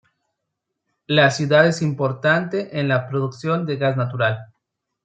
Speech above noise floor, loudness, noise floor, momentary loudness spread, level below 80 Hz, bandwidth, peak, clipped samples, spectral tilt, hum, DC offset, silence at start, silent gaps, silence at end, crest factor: 60 dB; -20 LUFS; -79 dBFS; 8 LU; -64 dBFS; 9 kHz; -2 dBFS; under 0.1%; -6 dB/octave; none; under 0.1%; 1.1 s; none; 0.6 s; 20 dB